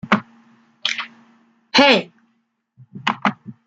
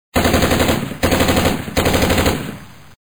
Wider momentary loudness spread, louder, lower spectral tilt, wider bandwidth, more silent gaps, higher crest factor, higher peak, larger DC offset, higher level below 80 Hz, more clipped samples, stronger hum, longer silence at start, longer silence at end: first, 15 LU vs 7 LU; about the same, -18 LUFS vs -16 LUFS; about the same, -4 dB/octave vs -4.5 dB/octave; second, 9 kHz vs over 20 kHz; neither; about the same, 20 dB vs 16 dB; about the same, 0 dBFS vs -2 dBFS; second, under 0.1% vs 0.7%; second, -64 dBFS vs -28 dBFS; neither; neither; about the same, 0.05 s vs 0.15 s; second, 0.15 s vs 0.35 s